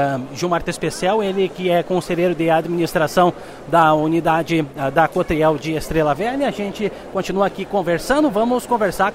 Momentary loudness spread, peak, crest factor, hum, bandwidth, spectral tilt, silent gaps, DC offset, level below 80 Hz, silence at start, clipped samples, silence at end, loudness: 7 LU; -2 dBFS; 16 dB; none; 16 kHz; -5.5 dB/octave; none; under 0.1%; -42 dBFS; 0 s; under 0.1%; 0 s; -19 LUFS